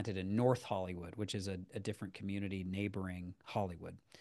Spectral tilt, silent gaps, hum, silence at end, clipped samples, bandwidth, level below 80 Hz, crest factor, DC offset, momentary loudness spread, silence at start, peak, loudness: -6.5 dB/octave; none; none; 0 s; under 0.1%; 12.5 kHz; -68 dBFS; 22 dB; under 0.1%; 11 LU; 0 s; -18 dBFS; -40 LUFS